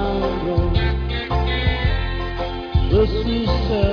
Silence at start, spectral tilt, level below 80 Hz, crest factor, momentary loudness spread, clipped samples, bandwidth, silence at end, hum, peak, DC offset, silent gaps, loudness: 0 s; -8 dB/octave; -22 dBFS; 14 dB; 7 LU; under 0.1%; 5.4 kHz; 0 s; none; -4 dBFS; under 0.1%; none; -21 LUFS